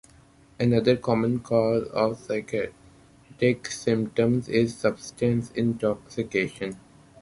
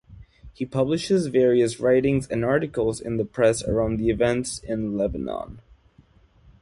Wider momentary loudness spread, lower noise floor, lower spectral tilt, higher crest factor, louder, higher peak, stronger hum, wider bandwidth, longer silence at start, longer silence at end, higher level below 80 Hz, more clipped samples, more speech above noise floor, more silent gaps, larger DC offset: about the same, 8 LU vs 10 LU; about the same, -55 dBFS vs -56 dBFS; about the same, -6.5 dB/octave vs -6 dB/octave; about the same, 20 dB vs 16 dB; second, -26 LUFS vs -23 LUFS; about the same, -6 dBFS vs -8 dBFS; neither; about the same, 11.5 kHz vs 11.5 kHz; first, 0.6 s vs 0.1 s; second, 0.45 s vs 1 s; second, -56 dBFS vs -44 dBFS; neither; second, 30 dB vs 34 dB; neither; neither